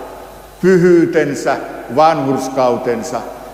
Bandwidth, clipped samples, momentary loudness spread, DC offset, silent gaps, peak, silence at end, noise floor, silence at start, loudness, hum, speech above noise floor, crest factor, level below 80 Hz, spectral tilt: 15.5 kHz; under 0.1%; 13 LU; under 0.1%; none; 0 dBFS; 0 s; -34 dBFS; 0 s; -14 LUFS; none; 21 dB; 14 dB; -46 dBFS; -6.5 dB/octave